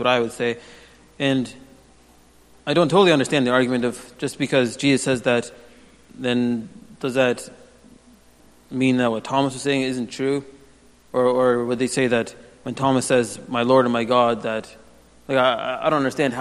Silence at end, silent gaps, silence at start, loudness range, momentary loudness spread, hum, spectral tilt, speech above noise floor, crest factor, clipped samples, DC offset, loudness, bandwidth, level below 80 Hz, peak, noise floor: 0 s; none; 0 s; 4 LU; 12 LU; none; -5 dB/octave; 32 dB; 20 dB; under 0.1%; under 0.1%; -21 LUFS; 12.5 kHz; -58 dBFS; -2 dBFS; -52 dBFS